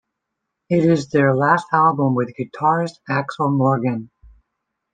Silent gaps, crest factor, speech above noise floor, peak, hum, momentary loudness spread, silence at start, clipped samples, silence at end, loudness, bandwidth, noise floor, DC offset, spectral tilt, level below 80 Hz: none; 18 dB; 61 dB; -2 dBFS; none; 8 LU; 0.7 s; under 0.1%; 0.85 s; -18 LUFS; 9.2 kHz; -79 dBFS; under 0.1%; -8 dB/octave; -58 dBFS